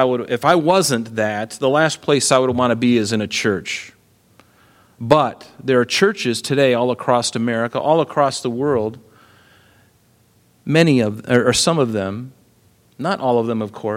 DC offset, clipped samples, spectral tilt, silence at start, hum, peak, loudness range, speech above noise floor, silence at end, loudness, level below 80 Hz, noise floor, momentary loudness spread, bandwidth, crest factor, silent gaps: under 0.1%; under 0.1%; -4.5 dB/octave; 0 s; none; 0 dBFS; 4 LU; 39 dB; 0 s; -18 LUFS; -56 dBFS; -56 dBFS; 9 LU; 16.5 kHz; 18 dB; none